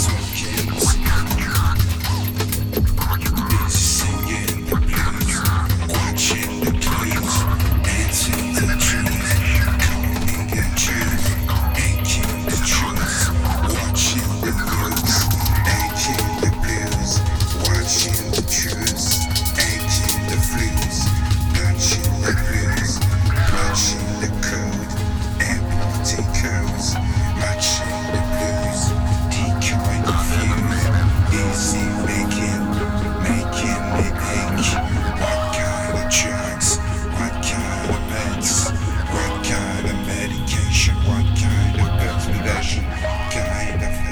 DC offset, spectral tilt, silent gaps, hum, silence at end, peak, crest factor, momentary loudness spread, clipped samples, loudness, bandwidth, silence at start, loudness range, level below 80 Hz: under 0.1%; -4 dB/octave; none; none; 0 s; -6 dBFS; 12 dB; 5 LU; under 0.1%; -19 LUFS; over 20 kHz; 0 s; 2 LU; -24 dBFS